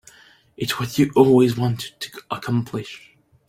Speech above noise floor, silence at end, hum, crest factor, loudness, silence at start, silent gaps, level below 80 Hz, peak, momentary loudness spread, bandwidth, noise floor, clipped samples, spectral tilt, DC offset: 31 dB; 0.5 s; none; 20 dB; -20 LUFS; 0.6 s; none; -56 dBFS; -2 dBFS; 18 LU; 16.5 kHz; -50 dBFS; under 0.1%; -6.5 dB/octave; under 0.1%